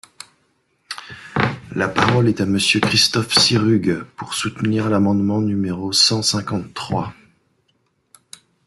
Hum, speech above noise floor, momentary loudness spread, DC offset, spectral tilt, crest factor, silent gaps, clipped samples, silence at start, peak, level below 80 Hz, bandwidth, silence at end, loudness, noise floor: none; 47 dB; 12 LU; under 0.1%; -4 dB/octave; 20 dB; none; under 0.1%; 0.9 s; 0 dBFS; -52 dBFS; 12.5 kHz; 1.55 s; -18 LUFS; -65 dBFS